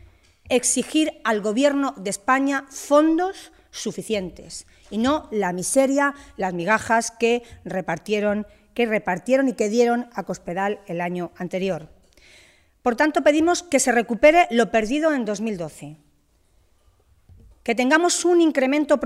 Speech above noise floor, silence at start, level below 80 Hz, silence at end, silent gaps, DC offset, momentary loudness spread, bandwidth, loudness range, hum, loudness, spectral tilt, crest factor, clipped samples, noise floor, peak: 40 dB; 0.45 s; -54 dBFS; 0 s; none; under 0.1%; 13 LU; 15.5 kHz; 6 LU; none; -21 LUFS; -3.5 dB/octave; 18 dB; under 0.1%; -61 dBFS; -4 dBFS